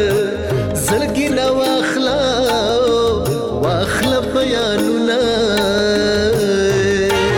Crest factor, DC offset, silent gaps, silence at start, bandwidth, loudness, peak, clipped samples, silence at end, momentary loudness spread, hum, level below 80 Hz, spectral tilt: 8 dB; under 0.1%; none; 0 s; 20 kHz; -16 LUFS; -8 dBFS; under 0.1%; 0 s; 3 LU; none; -36 dBFS; -4.5 dB/octave